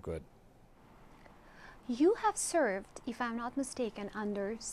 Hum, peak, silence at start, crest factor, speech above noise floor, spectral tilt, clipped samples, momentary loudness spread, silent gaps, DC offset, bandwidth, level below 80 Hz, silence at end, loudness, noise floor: none; -18 dBFS; 0.05 s; 18 dB; 26 dB; -4 dB/octave; under 0.1%; 15 LU; none; under 0.1%; 15 kHz; -60 dBFS; 0 s; -35 LUFS; -60 dBFS